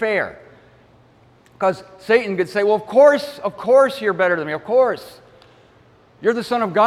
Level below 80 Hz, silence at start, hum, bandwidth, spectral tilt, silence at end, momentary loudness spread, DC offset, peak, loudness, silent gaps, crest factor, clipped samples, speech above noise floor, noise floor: -62 dBFS; 0 s; none; 13.5 kHz; -5.5 dB/octave; 0 s; 11 LU; under 0.1%; -2 dBFS; -18 LUFS; none; 16 dB; under 0.1%; 34 dB; -52 dBFS